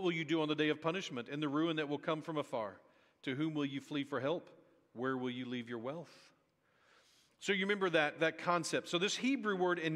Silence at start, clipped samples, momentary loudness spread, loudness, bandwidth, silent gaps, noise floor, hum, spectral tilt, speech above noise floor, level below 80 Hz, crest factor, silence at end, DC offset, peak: 0 s; under 0.1%; 10 LU; -37 LUFS; 12.5 kHz; none; -75 dBFS; none; -4.5 dB/octave; 38 dB; -84 dBFS; 20 dB; 0 s; under 0.1%; -18 dBFS